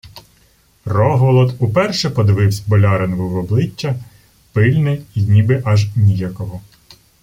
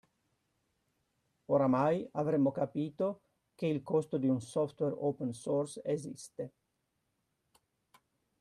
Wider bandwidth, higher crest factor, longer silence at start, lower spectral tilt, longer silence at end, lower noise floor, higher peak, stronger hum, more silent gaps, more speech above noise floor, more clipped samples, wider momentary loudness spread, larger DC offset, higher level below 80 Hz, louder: first, 15.5 kHz vs 12 kHz; about the same, 14 dB vs 18 dB; second, 0.05 s vs 1.5 s; about the same, -7 dB/octave vs -7.5 dB/octave; second, 0.65 s vs 1.95 s; second, -53 dBFS vs -82 dBFS; first, -2 dBFS vs -16 dBFS; neither; neither; second, 39 dB vs 49 dB; neither; second, 10 LU vs 13 LU; neither; first, -46 dBFS vs -76 dBFS; first, -15 LUFS vs -34 LUFS